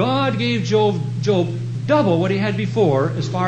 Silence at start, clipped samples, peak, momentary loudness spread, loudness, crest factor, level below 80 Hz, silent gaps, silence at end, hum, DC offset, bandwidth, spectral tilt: 0 s; under 0.1%; -4 dBFS; 5 LU; -19 LUFS; 14 dB; -54 dBFS; none; 0 s; none; under 0.1%; 8.6 kHz; -7 dB/octave